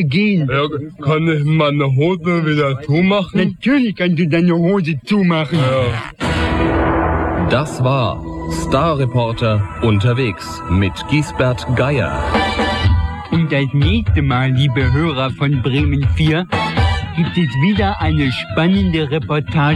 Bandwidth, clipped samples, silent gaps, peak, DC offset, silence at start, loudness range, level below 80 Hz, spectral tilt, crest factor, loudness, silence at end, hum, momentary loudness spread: 11.5 kHz; under 0.1%; none; -2 dBFS; under 0.1%; 0 s; 2 LU; -28 dBFS; -7 dB/octave; 14 dB; -16 LUFS; 0 s; none; 4 LU